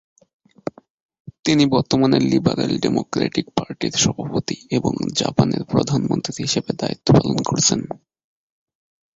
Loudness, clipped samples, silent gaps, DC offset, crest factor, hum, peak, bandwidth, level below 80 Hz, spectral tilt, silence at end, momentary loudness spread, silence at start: -19 LUFS; under 0.1%; 1.39-1.43 s; under 0.1%; 20 dB; none; -2 dBFS; 8 kHz; -48 dBFS; -5 dB/octave; 1.2 s; 10 LU; 1.25 s